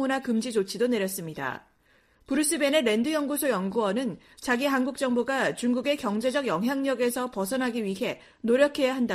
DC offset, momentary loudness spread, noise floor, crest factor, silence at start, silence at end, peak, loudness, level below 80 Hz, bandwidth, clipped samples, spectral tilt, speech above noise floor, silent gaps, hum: under 0.1%; 9 LU; -63 dBFS; 20 dB; 0 s; 0 s; -8 dBFS; -27 LUFS; -64 dBFS; 15.5 kHz; under 0.1%; -4 dB/octave; 37 dB; none; none